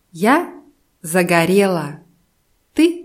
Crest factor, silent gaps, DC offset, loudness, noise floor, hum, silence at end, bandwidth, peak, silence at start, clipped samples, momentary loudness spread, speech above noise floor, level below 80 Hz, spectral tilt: 18 dB; none; under 0.1%; -16 LUFS; -62 dBFS; none; 0 s; 16 kHz; 0 dBFS; 0.15 s; under 0.1%; 17 LU; 47 dB; -58 dBFS; -5.5 dB/octave